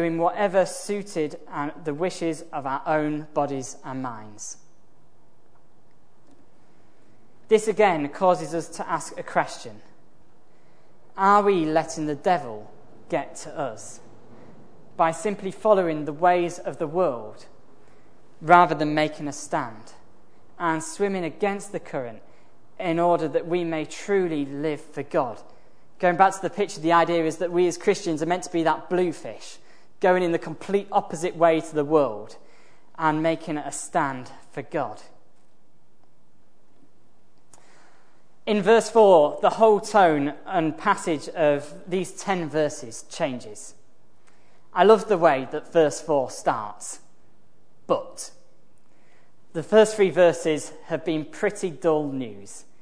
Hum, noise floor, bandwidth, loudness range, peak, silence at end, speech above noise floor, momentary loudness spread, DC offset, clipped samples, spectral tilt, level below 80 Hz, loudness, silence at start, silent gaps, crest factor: none; -64 dBFS; 11 kHz; 9 LU; 0 dBFS; 0.2 s; 41 dB; 18 LU; 0.9%; under 0.1%; -5 dB/octave; -68 dBFS; -23 LUFS; 0 s; none; 24 dB